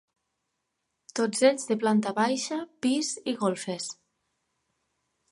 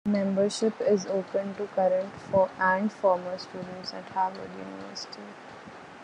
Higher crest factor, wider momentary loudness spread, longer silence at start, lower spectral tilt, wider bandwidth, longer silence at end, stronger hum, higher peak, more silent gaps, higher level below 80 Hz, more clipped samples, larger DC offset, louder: about the same, 20 dB vs 18 dB; second, 12 LU vs 16 LU; first, 1.15 s vs 0.05 s; second, -4 dB/octave vs -5.5 dB/octave; first, 11.5 kHz vs 10 kHz; first, 1.4 s vs 0 s; neither; about the same, -8 dBFS vs -10 dBFS; neither; second, -78 dBFS vs -70 dBFS; neither; neither; about the same, -27 LUFS vs -28 LUFS